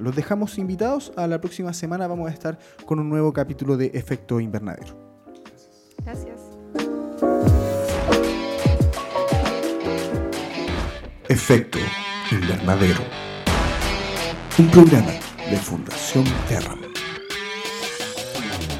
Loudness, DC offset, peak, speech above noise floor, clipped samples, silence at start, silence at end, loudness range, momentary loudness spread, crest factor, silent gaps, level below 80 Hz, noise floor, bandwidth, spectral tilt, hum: -21 LUFS; under 0.1%; 0 dBFS; 31 dB; under 0.1%; 0 s; 0 s; 9 LU; 12 LU; 22 dB; none; -34 dBFS; -50 dBFS; 16.5 kHz; -6 dB/octave; none